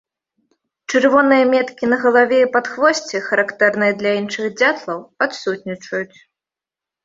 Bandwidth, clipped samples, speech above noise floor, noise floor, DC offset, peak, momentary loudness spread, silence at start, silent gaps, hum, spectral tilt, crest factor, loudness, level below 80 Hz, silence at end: 7.8 kHz; under 0.1%; 71 dB; -88 dBFS; under 0.1%; -2 dBFS; 12 LU; 0.9 s; none; none; -4 dB/octave; 16 dB; -17 LUFS; -64 dBFS; 1 s